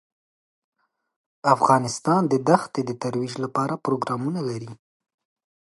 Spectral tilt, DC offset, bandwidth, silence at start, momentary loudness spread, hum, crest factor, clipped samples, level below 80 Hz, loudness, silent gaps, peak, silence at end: -6 dB/octave; under 0.1%; 11.5 kHz; 1.45 s; 10 LU; none; 22 dB; under 0.1%; -70 dBFS; -23 LUFS; none; -2 dBFS; 0.95 s